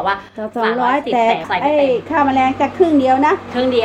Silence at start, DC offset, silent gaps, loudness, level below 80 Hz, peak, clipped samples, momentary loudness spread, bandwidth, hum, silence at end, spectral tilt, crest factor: 0 s; under 0.1%; none; -15 LUFS; -52 dBFS; -2 dBFS; under 0.1%; 6 LU; 8.8 kHz; none; 0 s; -6 dB/octave; 14 dB